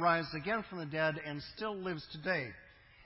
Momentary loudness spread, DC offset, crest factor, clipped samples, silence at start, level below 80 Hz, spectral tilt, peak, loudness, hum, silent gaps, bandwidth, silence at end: 8 LU; under 0.1%; 20 dB; under 0.1%; 0 s; -66 dBFS; -9 dB/octave; -18 dBFS; -37 LUFS; none; none; 5.8 kHz; 0 s